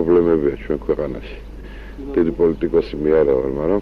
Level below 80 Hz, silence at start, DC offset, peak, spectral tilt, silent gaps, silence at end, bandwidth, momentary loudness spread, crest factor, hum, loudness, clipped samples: -34 dBFS; 0 s; under 0.1%; -4 dBFS; -9.5 dB/octave; none; 0 s; 5.6 kHz; 21 LU; 14 dB; none; -19 LUFS; under 0.1%